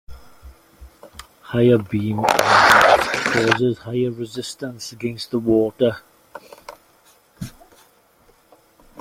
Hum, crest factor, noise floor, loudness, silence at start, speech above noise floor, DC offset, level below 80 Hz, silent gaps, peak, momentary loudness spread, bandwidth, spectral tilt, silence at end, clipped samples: none; 20 dB; -56 dBFS; -18 LUFS; 0.1 s; 37 dB; under 0.1%; -50 dBFS; none; 0 dBFS; 23 LU; 16.5 kHz; -4.5 dB/octave; 0 s; under 0.1%